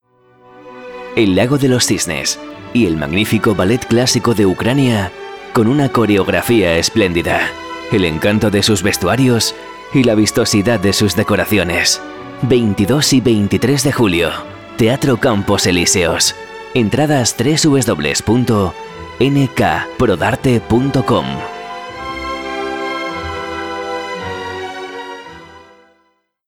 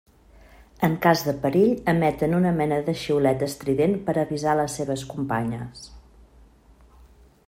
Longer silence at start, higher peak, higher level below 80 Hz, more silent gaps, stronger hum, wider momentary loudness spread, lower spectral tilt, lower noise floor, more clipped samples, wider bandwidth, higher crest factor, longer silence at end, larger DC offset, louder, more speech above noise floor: second, 0.55 s vs 0.8 s; about the same, -2 dBFS vs -4 dBFS; first, -40 dBFS vs -52 dBFS; neither; neither; first, 12 LU vs 8 LU; second, -4.5 dB/octave vs -6.5 dB/octave; first, -61 dBFS vs -53 dBFS; neither; first, 19 kHz vs 16 kHz; second, 12 dB vs 20 dB; second, 0.9 s vs 1.5 s; neither; first, -14 LUFS vs -23 LUFS; first, 47 dB vs 31 dB